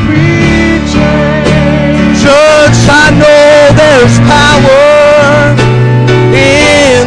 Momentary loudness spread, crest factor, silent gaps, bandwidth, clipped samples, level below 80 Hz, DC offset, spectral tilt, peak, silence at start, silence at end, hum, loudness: 5 LU; 4 dB; none; 11 kHz; 9%; -22 dBFS; under 0.1%; -5.5 dB/octave; 0 dBFS; 0 s; 0 s; none; -4 LUFS